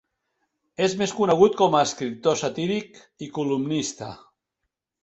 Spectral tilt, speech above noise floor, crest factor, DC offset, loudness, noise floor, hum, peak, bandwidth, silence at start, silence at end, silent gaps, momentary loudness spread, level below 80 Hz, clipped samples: -4.5 dB/octave; 58 dB; 20 dB; under 0.1%; -23 LUFS; -81 dBFS; none; -4 dBFS; 8.2 kHz; 0.8 s; 0.9 s; none; 18 LU; -64 dBFS; under 0.1%